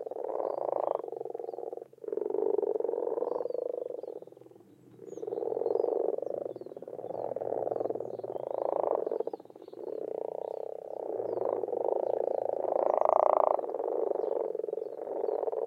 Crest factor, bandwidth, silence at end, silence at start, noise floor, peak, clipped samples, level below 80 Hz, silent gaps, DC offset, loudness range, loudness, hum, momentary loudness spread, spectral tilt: 24 dB; 7 kHz; 0 s; 0 s; -56 dBFS; -8 dBFS; under 0.1%; -84 dBFS; none; under 0.1%; 6 LU; -33 LUFS; none; 12 LU; -8 dB/octave